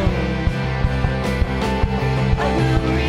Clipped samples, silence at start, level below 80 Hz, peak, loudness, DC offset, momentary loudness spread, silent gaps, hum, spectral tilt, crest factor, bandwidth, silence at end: under 0.1%; 0 s; -24 dBFS; -4 dBFS; -20 LUFS; under 0.1%; 3 LU; none; none; -7 dB/octave; 14 dB; 12 kHz; 0 s